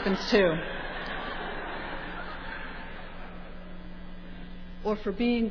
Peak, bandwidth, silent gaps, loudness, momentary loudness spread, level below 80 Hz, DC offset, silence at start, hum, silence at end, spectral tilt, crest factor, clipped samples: -10 dBFS; 5.4 kHz; none; -31 LUFS; 21 LU; -42 dBFS; under 0.1%; 0 s; none; 0 s; -6 dB/octave; 20 dB; under 0.1%